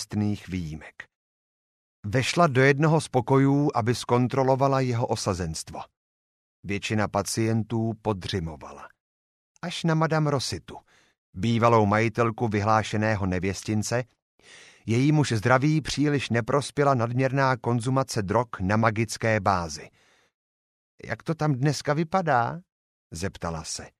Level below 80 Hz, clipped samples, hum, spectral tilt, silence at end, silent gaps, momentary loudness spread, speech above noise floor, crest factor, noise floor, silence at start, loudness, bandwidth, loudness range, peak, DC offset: -54 dBFS; under 0.1%; none; -6 dB/octave; 0.1 s; 1.15-2.03 s, 5.97-6.63 s, 9.00-9.55 s, 11.18-11.33 s, 14.22-14.38 s, 20.34-20.98 s, 22.72-23.10 s; 14 LU; over 65 dB; 20 dB; under -90 dBFS; 0 s; -25 LUFS; 13.5 kHz; 6 LU; -4 dBFS; under 0.1%